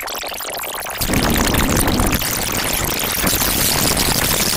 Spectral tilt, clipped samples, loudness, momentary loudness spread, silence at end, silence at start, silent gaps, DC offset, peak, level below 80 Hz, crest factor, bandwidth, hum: -2.5 dB/octave; under 0.1%; -17 LUFS; 9 LU; 0 s; 0 s; none; under 0.1%; -2 dBFS; -28 dBFS; 16 dB; 17 kHz; none